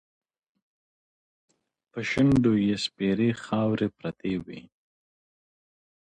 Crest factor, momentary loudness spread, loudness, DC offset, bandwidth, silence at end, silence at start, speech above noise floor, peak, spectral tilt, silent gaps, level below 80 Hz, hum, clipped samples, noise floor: 18 dB; 13 LU; -26 LUFS; under 0.1%; 10 kHz; 1.4 s; 1.95 s; over 65 dB; -10 dBFS; -6.5 dB/octave; none; -56 dBFS; none; under 0.1%; under -90 dBFS